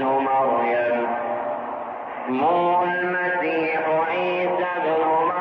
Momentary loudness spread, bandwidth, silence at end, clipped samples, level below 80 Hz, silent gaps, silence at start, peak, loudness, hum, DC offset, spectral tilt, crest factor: 8 LU; 6 kHz; 0 s; under 0.1%; -72 dBFS; none; 0 s; -12 dBFS; -22 LUFS; none; under 0.1%; -8 dB/octave; 10 dB